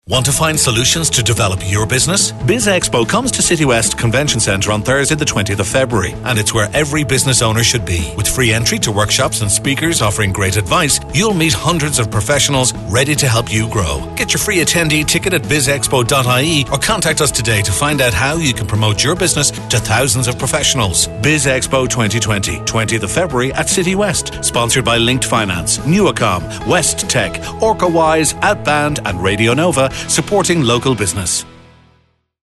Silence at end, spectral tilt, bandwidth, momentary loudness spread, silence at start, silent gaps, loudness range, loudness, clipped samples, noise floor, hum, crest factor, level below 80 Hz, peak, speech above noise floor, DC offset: 0.95 s; -3.5 dB/octave; 12.5 kHz; 4 LU; 0.1 s; none; 1 LU; -13 LUFS; under 0.1%; -56 dBFS; none; 12 dB; -32 dBFS; -2 dBFS; 42 dB; under 0.1%